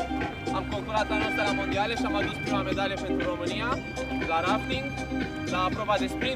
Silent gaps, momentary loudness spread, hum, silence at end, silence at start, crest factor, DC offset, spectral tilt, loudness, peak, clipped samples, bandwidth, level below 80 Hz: none; 5 LU; none; 0 s; 0 s; 16 dB; under 0.1%; -5 dB/octave; -28 LUFS; -12 dBFS; under 0.1%; 15.5 kHz; -44 dBFS